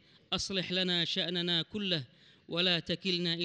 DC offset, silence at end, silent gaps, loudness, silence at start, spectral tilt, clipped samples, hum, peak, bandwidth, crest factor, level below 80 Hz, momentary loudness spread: under 0.1%; 0 s; none; -31 LUFS; 0.3 s; -4 dB/octave; under 0.1%; none; -16 dBFS; 9.6 kHz; 16 dB; -66 dBFS; 6 LU